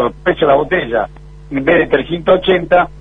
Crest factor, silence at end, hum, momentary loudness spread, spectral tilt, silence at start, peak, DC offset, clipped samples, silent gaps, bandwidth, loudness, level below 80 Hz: 14 dB; 0 s; none; 7 LU; -7.5 dB/octave; 0 s; 0 dBFS; under 0.1%; under 0.1%; none; 4 kHz; -14 LUFS; -36 dBFS